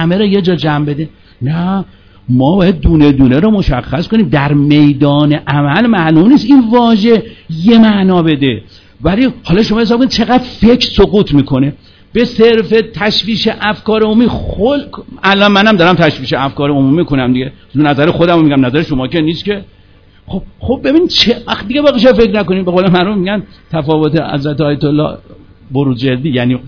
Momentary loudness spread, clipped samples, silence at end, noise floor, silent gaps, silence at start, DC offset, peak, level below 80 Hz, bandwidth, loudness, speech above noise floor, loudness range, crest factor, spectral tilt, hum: 10 LU; 2%; 0 s; -42 dBFS; none; 0 s; under 0.1%; 0 dBFS; -30 dBFS; 5.4 kHz; -10 LUFS; 32 dB; 4 LU; 10 dB; -7.5 dB/octave; none